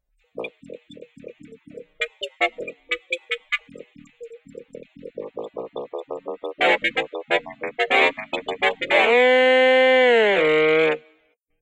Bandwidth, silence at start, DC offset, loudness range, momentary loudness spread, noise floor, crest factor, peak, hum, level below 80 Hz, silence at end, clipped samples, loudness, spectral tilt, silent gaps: 9.6 kHz; 0.35 s; under 0.1%; 14 LU; 20 LU; -64 dBFS; 18 dB; -4 dBFS; none; -66 dBFS; 0.65 s; under 0.1%; -19 LUFS; -3.5 dB/octave; none